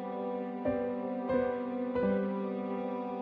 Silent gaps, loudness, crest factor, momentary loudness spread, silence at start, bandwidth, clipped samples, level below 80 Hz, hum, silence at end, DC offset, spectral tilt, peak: none; -34 LUFS; 14 dB; 5 LU; 0 s; 5 kHz; under 0.1%; -62 dBFS; none; 0 s; under 0.1%; -10 dB/octave; -18 dBFS